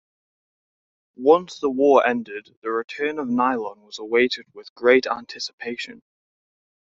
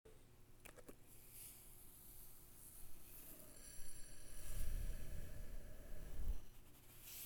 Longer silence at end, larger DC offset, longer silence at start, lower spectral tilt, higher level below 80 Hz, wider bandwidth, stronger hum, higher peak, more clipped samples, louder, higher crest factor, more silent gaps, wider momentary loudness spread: first, 0.9 s vs 0 s; neither; first, 1.2 s vs 0.05 s; second, -2 dB/octave vs -3.5 dB/octave; second, -68 dBFS vs -52 dBFS; second, 7.6 kHz vs over 20 kHz; neither; first, -2 dBFS vs -30 dBFS; neither; first, -21 LUFS vs -57 LUFS; about the same, 20 dB vs 18 dB; first, 2.57-2.62 s, 2.84-2.88 s, 4.70-4.76 s, 5.53-5.58 s vs none; first, 15 LU vs 11 LU